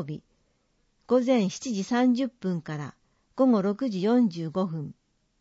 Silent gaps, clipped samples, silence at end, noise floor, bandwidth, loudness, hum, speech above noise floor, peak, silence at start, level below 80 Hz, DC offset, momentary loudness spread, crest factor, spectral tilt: none; under 0.1%; 0.5 s; -70 dBFS; 8 kHz; -26 LUFS; none; 45 dB; -10 dBFS; 0 s; -70 dBFS; under 0.1%; 15 LU; 16 dB; -6.5 dB/octave